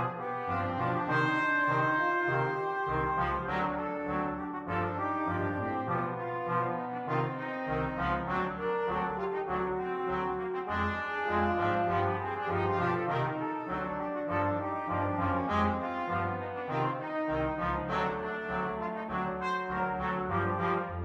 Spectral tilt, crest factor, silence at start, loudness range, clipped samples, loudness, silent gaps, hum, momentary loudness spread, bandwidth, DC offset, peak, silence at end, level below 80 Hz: -8 dB/octave; 16 dB; 0 s; 3 LU; under 0.1%; -32 LUFS; none; none; 6 LU; 9.4 kHz; under 0.1%; -16 dBFS; 0 s; -52 dBFS